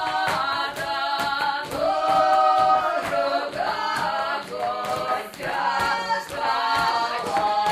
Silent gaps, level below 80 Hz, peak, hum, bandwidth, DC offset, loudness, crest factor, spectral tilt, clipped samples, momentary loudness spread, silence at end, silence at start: none; -56 dBFS; -8 dBFS; none; 15.5 kHz; under 0.1%; -23 LUFS; 16 dB; -3 dB/octave; under 0.1%; 8 LU; 0 s; 0 s